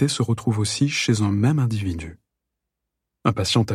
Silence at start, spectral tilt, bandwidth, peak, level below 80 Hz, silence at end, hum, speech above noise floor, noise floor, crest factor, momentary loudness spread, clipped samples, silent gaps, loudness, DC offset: 0 s; -5 dB/octave; 13.5 kHz; -4 dBFS; -48 dBFS; 0 s; none; 61 dB; -82 dBFS; 18 dB; 8 LU; under 0.1%; none; -22 LUFS; under 0.1%